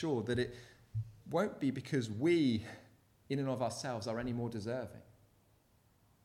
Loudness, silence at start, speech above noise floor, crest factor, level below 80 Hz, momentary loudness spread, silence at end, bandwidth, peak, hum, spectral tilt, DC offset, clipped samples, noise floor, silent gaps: -37 LUFS; 0 s; 34 dB; 16 dB; -66 dBFS; 13 LU; 1.25 s; 14.5 kHz; -22 dBFS; none; -6.5 dB/octave; under 0.1%; under 0.1%; -70 dBFS; none